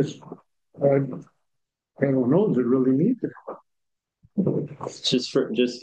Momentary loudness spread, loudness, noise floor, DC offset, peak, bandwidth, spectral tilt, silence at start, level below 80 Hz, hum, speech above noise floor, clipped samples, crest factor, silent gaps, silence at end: 18 LU; -24 LUFS; -81 dBFS; under 0.1%; -6 dBFS; 9 kHz; -6.5 dB/octave; 0 s; -70 dBFS; none; 58 dB; under 0.1%; 18 dB; none; 0 s